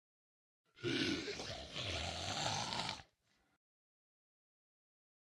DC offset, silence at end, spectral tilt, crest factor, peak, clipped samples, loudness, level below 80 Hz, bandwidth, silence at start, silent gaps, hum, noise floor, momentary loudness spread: under 0.1%; 2.3 s; -3 dB/octave; 24 dB; -22 dBFS; under 0.1%; -41 LUFS; -66 dBFS; 16 kHz; 0.75 s; none; none; -79 dBFS; 7 LU